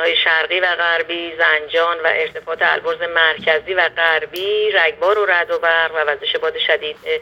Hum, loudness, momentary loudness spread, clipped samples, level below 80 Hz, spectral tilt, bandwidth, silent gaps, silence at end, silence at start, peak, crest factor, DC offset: none; -16 LUFS; 5 LU; under 0.1%; -58 dBFS; -3 dB/octave; 16.5 kHz; none; 0 s; 0 s; 0 dBFS; 18 dB; under 0.1%